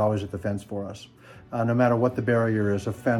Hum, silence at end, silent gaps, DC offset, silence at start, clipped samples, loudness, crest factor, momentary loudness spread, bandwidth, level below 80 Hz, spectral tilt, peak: none; 0 s; none; under 0.1%; 0 s; under 0.1%; -25 LUFS; 18 dB; 13 LU; 12.5 kHz; -56 dBFS; -8 dB/octave; -8 dBFS